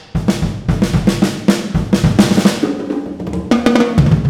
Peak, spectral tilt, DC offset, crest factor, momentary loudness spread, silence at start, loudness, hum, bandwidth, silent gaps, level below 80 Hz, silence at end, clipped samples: 0 dBFS; -6.5 dB/octave; under 0.1%; 14 dB; 9 LU; 0 s; -15 LUFS; none; 16 kHz; none; -28 dBFS; 0 s; under 0.1%